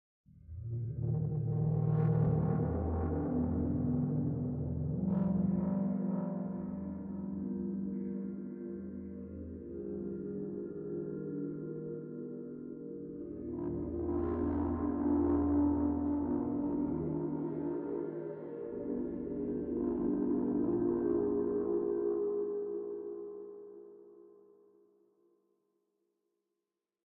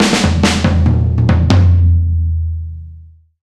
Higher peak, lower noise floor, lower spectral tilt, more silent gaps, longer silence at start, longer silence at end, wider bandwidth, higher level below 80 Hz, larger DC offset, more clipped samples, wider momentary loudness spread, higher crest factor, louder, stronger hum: second, -20 dBFS vs 0 dBFS; first, -89 dBFS vs -38 dBFS; first, -13 dB/octave vs -6 dB/octave; neither; first, 0.3 s vs 0 s; first, 2.7 s vs 0.4 s; second, 2.6 kHz vs 11 kHz; second, -56 dBFS vs -20 dBFS; neither; neither; about the same, 13 LU vs 12 LU; about the same, 14 dB vs 12 dB; second, -36 LUFS vs -13 LUFS; neither